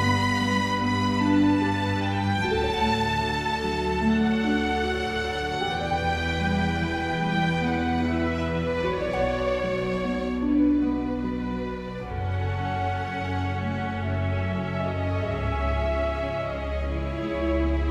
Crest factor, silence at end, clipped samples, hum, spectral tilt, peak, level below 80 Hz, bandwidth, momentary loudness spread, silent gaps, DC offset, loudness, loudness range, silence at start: 16 dB; 0 s; under 0.1%; none; -6.5 dB/octave; -10 dBFS; -38 dBFS; 13 kHz; 6 LU; none; under 0.1%; -26 LUFS; 4 LU; 0 s